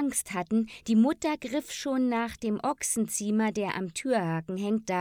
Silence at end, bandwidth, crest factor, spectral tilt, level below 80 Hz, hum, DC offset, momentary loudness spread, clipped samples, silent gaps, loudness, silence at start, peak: 0 s; 19 kHz; 14 dB; -4.5 dB/octave; -62 dBFS; none; under 0.1%; 7 LU; under 0.1%; none; -29 LUFS; 0 s; -14 dBFS